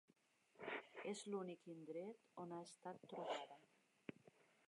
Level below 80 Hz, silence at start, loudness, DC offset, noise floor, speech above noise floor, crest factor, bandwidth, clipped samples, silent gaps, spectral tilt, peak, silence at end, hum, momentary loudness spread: under -90 dBFS; 0.55 s; -53 LUFS; under 0.1%; -79 dBFS; 27 dB; 18 dB; 11 kHz; under 0.1%; none; -4.5 dB/octave; -36 dBFS; 0.4 s; none; 11 LU